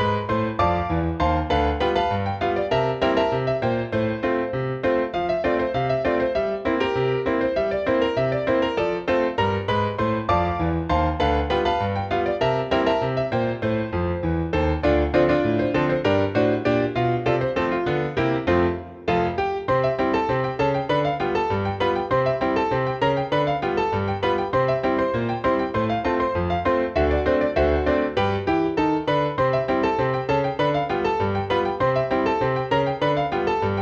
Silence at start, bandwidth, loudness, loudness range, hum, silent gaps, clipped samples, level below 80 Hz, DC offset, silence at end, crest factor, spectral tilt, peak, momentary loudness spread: 0 s; 7.8 kHz; -22 LUFS; 1 LU; none; none; under 0.1%; -38 dBFS; under 0.1%; 0 s; 16 dB; -7.5 dB/octave; -6 dBFS; 3 LU